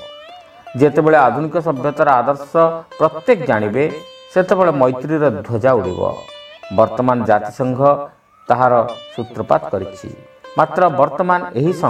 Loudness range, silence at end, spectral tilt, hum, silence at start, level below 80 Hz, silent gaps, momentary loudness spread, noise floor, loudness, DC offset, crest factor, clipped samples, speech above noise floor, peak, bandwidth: 3 LU; 0 s; -7.5 dB/octave; none; 0 s; -54 dBFS; none; 15 LU; -39 dBFS; -16 LUFS; under 0.1%; 16 dB; under 0.1%; 23 dB; 0 dBFS; 10.5 kHz